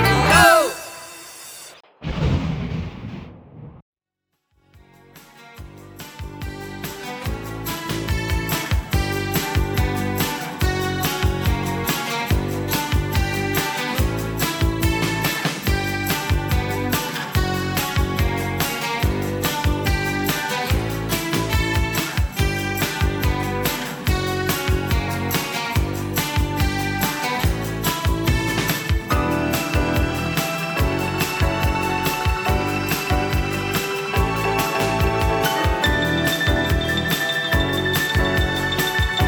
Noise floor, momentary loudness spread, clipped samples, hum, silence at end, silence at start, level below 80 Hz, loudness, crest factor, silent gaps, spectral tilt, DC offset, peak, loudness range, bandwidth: -78 dBFS; 9 LU; under 0.1%; none; 0 s; 0 s; -28 dBFS; -21 LUFS; 20 dB; 3.82-3.93 s; -4.5 dB/octave; under 0.1%; 0 dBFS; 10 LU; over 20 kHz